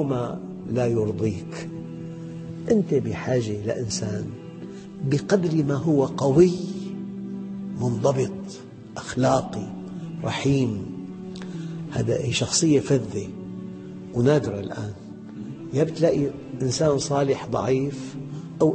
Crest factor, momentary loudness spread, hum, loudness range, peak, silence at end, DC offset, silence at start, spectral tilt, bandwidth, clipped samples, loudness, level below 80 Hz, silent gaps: 20 dB; 15 LU; none; 4 LU; -4 dBFS; 0 s; under 0.1%; 0 s; -6 dB/octave; 8.8 kHz; under 0.1%; -24 LUFS; -54 dBFS; none